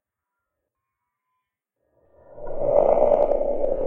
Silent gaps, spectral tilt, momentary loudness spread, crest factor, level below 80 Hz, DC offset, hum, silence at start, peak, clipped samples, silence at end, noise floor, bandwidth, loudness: none; -9.5 dB/octave; 16 LU; 20 dB; -38 dBFS; under 0.1%; none; 2.3 s; -4 dBFS; under 0.1%; 0 s; -83 dBFS; 3.2 kHz; -21 LUFS